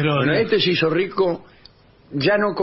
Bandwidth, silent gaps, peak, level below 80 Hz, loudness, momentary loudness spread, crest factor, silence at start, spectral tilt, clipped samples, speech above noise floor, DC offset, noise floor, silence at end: 5.8 kHz; none; -6 dBFS; -54 dBFS; -19 LUFS; 7 LU; 14 dB; 0 s; -9 dB/octave; under 0.1%; 31 dB; under 0.1%; -50 dBFS; 0 s